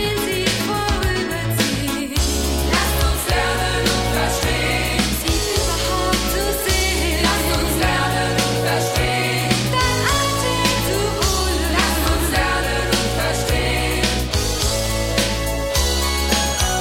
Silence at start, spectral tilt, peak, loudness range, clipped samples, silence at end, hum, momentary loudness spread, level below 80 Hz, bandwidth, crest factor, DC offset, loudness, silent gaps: 0 s; -3.5 dB/octave; -2 dBFS; 1 LU; under 0.1%; 0 s; none; 3 LU; -26 dBFS; 16.5 kHz; 16 dB; 0.2%; -18 LUFS; none